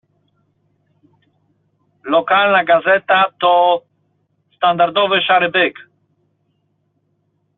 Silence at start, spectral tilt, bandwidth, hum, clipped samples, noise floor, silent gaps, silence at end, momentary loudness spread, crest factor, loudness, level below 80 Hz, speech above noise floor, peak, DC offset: 2.05 s; -0.5 dB/octave; 4.2 kHz; none; under 0.1%; -65 dBFS; none; 1.85 s; 6 LU; 16 dB; -14 LUFS; -66 dBFS; 51 dB; -2 dBFS; under 0.1%